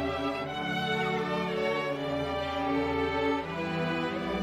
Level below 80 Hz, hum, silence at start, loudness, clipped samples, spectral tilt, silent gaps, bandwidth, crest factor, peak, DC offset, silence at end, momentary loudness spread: -52 dBFS; none; 0 s; -30 LUFS; under 0.1%; -6 dB/octave; none; 15 kHz; 14 dB; -16 dBFS; under 0.1%; 0 s; 3 LU